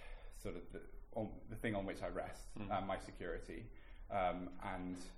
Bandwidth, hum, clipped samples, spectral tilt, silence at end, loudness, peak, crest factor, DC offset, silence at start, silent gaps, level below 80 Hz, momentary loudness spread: 15.5 kHz; none; under 0.1%; -6 dB/octave; 0 s; -45 LUFS; -26 dBFS; 18 dB; under 0.1%; 0 s; none; -54 dBFS; 13 LU